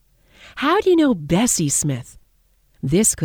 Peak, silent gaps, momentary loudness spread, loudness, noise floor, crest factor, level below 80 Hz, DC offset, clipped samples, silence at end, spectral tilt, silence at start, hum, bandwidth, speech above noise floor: -4 dBFS; none; 13 LU; -18 LUFS; -59 dBFS; 14 dB; -46 dBFS; under 0.1%; under 0.1%; 0 s; -4 dB/octave; 0.45 s; none; 20 kHz; 42 dB